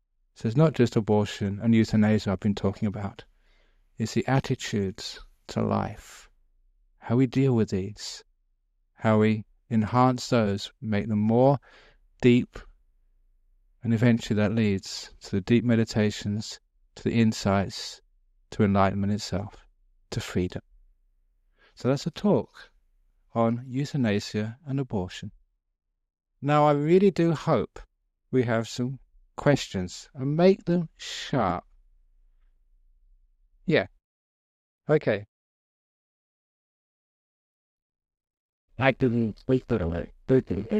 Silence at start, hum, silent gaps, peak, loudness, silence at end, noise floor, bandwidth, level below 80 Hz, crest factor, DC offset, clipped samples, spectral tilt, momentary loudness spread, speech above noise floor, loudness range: 0.4 s; none; 34.04-34.79 s, 35.28-37.90 s, 38.39-38.68 s; -6 dBFS; -26 LUFS; 0 s; -70 dBFS; 12.5 kHz; -54 dBFS; 20 dB; under 0.1%; under 0.1%; -7 dB/octave; 15 LU; 46 dB; 7 LU